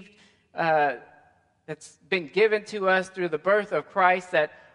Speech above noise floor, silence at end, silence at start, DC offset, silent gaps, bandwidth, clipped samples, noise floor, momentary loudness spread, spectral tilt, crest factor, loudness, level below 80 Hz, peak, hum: 37 dB; 0.3 s; 0 s; under 0.1%; none; 11 kHz; under 0.1%; -62 dBFS; 18 LU; -5 dB/octave; 20 dB; -24 LUFS; -76 dBFS; -6 dBFS; none